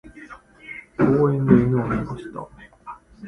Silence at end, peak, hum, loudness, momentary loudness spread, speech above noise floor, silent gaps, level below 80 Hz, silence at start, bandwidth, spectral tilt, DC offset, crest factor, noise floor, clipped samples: 0 s; -2 dBFS; none; -20 LUFS; 25 LU; 24 dB; none; -46 dBFS; 0.05 s; 10.5 kHz; -10 dB/octave; under 0.1%; 20 dB; -44 dBFS; under 0.1%